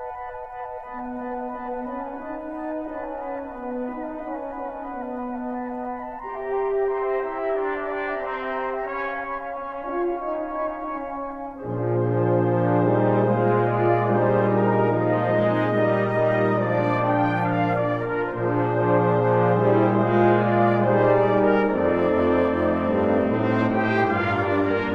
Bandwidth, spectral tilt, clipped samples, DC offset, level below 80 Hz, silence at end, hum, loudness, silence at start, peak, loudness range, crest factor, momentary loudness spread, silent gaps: 5.8 kHz; -9.5 dB/octave; under 0.1%; under 0.1%; -50 dBFS; 0 s; none; -23 LUFS; 0 s; -8 dBFS; 12 LU; 16 dB; 13 LU; none